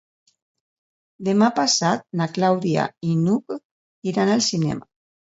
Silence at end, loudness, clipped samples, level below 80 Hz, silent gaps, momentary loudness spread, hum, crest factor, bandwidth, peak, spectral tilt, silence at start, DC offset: 0.4 s; -21 LUFS; under 0.1%; -62 dBFS; 3.65-4.02 s; 11 LU; none; 18 dB; 8 kHz; -4 dBFS; -4.5 dB/octave; 1.2 s; under 0.1%